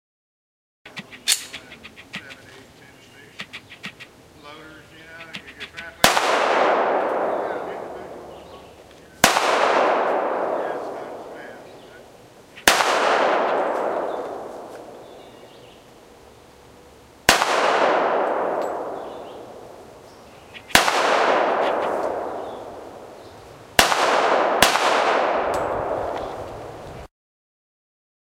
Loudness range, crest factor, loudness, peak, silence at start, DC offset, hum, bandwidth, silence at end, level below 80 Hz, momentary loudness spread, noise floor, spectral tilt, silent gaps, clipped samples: 10 LU; 24 dB; -20 LUFS; 0 dBFS; 0.85 s; under 0.1%; none; 16 kHz; 1.2 s; -52 dBFS; 24 LU; -48 dBFS; -1.5 dB/octave; none; under 0.1%